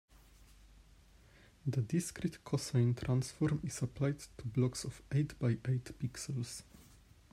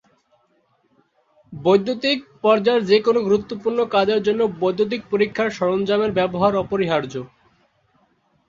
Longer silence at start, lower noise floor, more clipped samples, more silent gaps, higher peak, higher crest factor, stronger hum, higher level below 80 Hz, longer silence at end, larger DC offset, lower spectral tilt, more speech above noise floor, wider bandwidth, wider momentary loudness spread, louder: second, 0.65 s vs 1.5 s; about the same, -62 dBFS vs -64 dBFS; neither; neither; second, -20 dBFS vs -2 dBFS; about the same, 18 dB vs 18 dB; neither; about the same, -60 dBFS vs -56 dBFS; second, 0.35 s vs 1.2 s; neither; about the same, -6.5 dB/octave vs -6 dB/octave; second, 27 dB vs 45 dB; first, 14.5 kHz vs 7.4 kHz; first, 10 LU vs 7 LU; second, -37 LUFS vs -20 LUFS